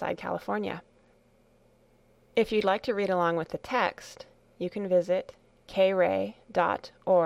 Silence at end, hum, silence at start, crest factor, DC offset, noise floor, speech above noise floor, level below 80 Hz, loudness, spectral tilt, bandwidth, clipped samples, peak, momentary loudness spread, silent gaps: 0 s; none; 0 s; 16 dB; under 0.1%; -63 dBFS; 35 dB; -62 dBFS; -29 LUFS; -6 dB/octave; 12.5 kHz; under 0.1%; -12 dBFS; 11 LU; none